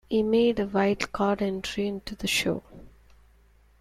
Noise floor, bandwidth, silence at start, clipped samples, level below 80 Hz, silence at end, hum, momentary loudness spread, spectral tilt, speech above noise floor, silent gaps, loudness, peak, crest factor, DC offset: -59 dBFS; 15 kHz; 0.1 s; under 0.1%; -52 dBFS; 0.95 s; none; 8 LU; -4.5 dB/octave; 33 dB; none; -26 LUFS; -8 dBFS; 20 dB; under 0.1%